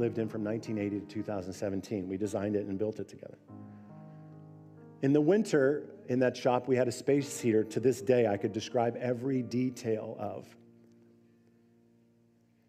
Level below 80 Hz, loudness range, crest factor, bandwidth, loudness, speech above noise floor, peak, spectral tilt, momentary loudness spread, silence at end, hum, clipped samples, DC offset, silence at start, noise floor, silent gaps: -78 dBFS; 8 LU; 20 dB; 15.5 kHz; -31 LUFS; 36 dB; -12 dBFS; -6.5 dB/octave; 22 LU; 2.2 s; none; under 0.1%; under 0.1%; 0 s; -67 dBFS; none